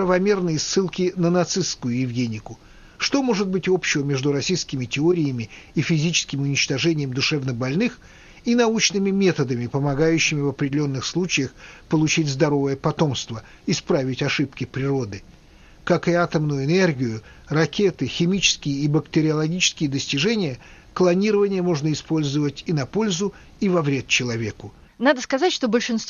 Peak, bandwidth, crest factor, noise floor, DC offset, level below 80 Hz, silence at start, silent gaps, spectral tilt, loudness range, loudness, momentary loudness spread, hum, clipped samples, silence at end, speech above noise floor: -4 dBFS; 7.4 kHz; 18 dB; -48 dBFS; under 0.1%; -50 dBFS; 0 s; none; -4.5 dB/octave; 2 LU; -22 LUFS; 7 LU; none; under 0.1%; 0 s; 27 dB